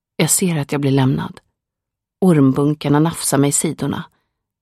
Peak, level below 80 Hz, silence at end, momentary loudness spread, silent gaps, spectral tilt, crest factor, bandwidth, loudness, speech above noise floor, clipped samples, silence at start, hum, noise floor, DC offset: -2 dBFS; -54 dBFS; 0.55 s; 10 LU; none; -5 dB/octave; 16 dB; 15 kHz; -16 LUFS; 67 dB; under 0.1%; 0.2 s; none; -83 dBFS; under 0.1%